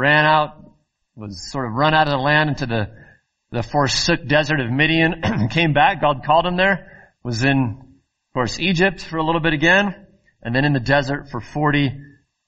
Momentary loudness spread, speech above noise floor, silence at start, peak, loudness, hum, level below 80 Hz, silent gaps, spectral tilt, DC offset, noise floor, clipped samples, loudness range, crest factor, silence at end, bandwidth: 14 LU; 37 dB; 0 s; -2 dBFS; -18 LUFS; none; -42 dBFS; none; -5.5 dB/octave; under 0.1%; -56 dBFS; under 0.1%; 3 LU; 18 dB; 0.4 s; 8.2 kHz